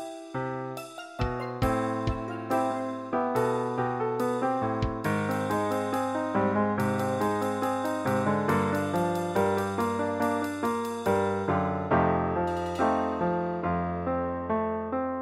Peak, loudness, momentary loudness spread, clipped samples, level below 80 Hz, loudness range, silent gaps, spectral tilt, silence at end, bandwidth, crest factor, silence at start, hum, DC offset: -12 dBFS; -28 LUFS; 5 LU; under 0.1%; -48 dBFS; 2 LU; none; -6.5 dB/octave; 0 s; 16 kHz; 16 dB; 0 s; none; under 0.1%